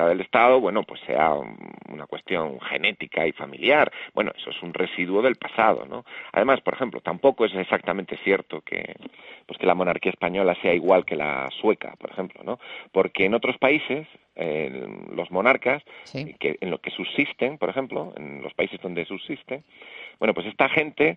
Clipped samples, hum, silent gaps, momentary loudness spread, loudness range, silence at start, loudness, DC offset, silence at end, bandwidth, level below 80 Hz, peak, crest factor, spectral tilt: under 0.1%; none; none; 16 LU; 5 LU; 0 s; -24 LUFS; under 0.1%; 0 s; 6.4 kHz; -64 dBFS; -4 dBFS; 22 dB; -7 dB/octave